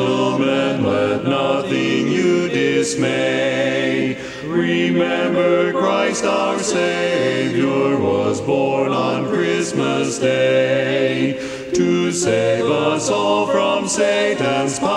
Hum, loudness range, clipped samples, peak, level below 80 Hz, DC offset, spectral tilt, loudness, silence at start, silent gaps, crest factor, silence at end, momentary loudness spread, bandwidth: none; 1 LU; under 0.1%; -4 dBFS; -56 dBFS; under 0.1%; -4.5 dB/octave; -18 LUFS; 0 s; none; 14 dB; 0 s; 3 LU; 12 kHz